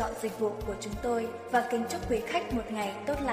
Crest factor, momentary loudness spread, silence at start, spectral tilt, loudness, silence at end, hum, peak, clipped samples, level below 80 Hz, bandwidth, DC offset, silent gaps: 18 dB; 5 LU; 0 s; -5 dB/octave; -32 LUFS; 0 s; none; -14 dBFS; under 0.1%; -48 dBFS; 15.5 kHz; under 0.1%; none